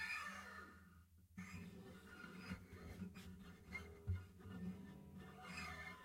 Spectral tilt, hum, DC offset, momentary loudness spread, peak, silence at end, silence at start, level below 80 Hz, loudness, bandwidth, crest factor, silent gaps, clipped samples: -5 dB/octave; none; under 0.1%; 10 LU; -34 dBFS; 0 s; 0 s; -66 dBFS; -54 LUFS; 16 kHz; 18 dB; none; under 0.1%